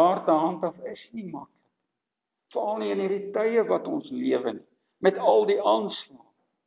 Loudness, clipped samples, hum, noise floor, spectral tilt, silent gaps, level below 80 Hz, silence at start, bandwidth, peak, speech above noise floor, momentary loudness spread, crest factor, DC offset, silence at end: -25 LUFS; under 0.1%; none; -85 dBFS; -9.5 dB/octave; none; -80 dBFS; 0 s; 4 kHz; -6 dBFS; 60 dB; 17 LU; 20 dB; under 0.1%; 0.5 s